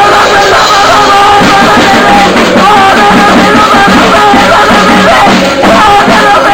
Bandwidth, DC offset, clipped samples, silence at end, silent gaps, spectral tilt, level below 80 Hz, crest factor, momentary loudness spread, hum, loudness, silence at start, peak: over 20 kHz; under 0.1%; 10%; 0 s; none; -3.5 dB/octave; -28 dBFS; 2 dB; 1 LU; none; -3 LUFS; 0 s; 0 dBFS